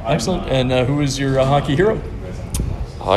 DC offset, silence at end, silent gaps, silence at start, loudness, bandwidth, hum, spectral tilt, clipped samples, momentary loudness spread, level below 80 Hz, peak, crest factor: under 0.1%; 0 s; none; 0 s; -19 LUFS; 13.5 kHz; none; -6 dB/octave; under 0.1%; 10 LU; -30 dBFS; -2 dBFS; 16 dB